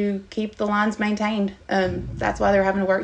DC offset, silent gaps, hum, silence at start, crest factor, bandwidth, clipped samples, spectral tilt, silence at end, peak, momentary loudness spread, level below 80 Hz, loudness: under 0.1%; none; none; 0 s; 14 dB; 8.6 kHz; under 0.1%; -6.5 dB/octave; 0 s; -8 dBFS; 7 LU; -42 dBFS; -23 LUFS